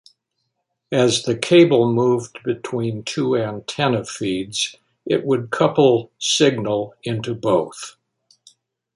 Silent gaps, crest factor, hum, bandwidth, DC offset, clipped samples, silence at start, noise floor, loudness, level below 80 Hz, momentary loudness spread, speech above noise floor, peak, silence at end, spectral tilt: none; 18 dB; none; 11.5 kHz; under 0.1%; under 0.1%; 0.9 s; -75 dBFS; -19 LUFS; -60 dBFS; 11 LU; 56 dB; -2 dBFS; 1.05 s; -5 dB/octave